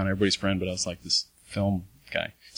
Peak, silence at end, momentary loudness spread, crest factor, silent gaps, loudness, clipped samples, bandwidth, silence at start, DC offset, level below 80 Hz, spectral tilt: -10 dBFS; 0.1 s; 8 LU; 18 dB; none; -28 LUFS; under 0.1%; 16 kHz; 0 s; under 0.1%; -52 dBFS; -4 dB/octave